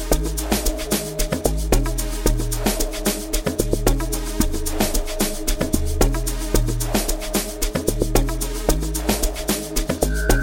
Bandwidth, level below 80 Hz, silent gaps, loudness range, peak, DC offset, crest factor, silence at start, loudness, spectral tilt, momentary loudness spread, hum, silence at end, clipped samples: 17 kHz; -24 dBFS; none; 0 LU; -2 dBFS; under 0.1%; 18 dB; 0 s; -22 LUFS; -4 dB/octave; 3 LU; none; 0 s; under 0.1%